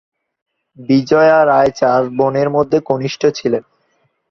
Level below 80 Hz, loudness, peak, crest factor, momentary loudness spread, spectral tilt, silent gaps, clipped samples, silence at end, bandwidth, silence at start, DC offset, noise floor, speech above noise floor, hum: -52 dBFS; -14 LUFS; 0 dBFS; 14 dB; 9 LU; -6.5 dB/octave; none; under 0.1%; 0.7 s; 7.2 kHz; 0.8 s; under 0.1%; -62 dBFS; 49 dB; none